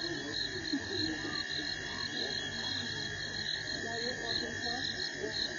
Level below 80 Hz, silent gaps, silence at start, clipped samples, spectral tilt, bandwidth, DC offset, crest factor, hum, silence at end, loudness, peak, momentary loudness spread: -60 dBFS; none; 0 s; under 0.1%; -2.5 dB/octave; 9.6 kHz; under 0.1%; 16 dB; 50 Hz at -55 dBFS; 0 s; -35 LUFS; -22 dBFS; 2 LU